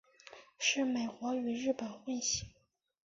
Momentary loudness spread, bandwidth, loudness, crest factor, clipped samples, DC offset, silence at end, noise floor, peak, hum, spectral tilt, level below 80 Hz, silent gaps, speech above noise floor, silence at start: 22 LU; 7.6 kHz; -35 LUFS; 18 dB; under 0.1%; under 0.1%; 0.55 s; -57 dBFS; -18 dBFS; none; -2 dB/octave; -66 dBFS; none; 22 dB; 0.25 s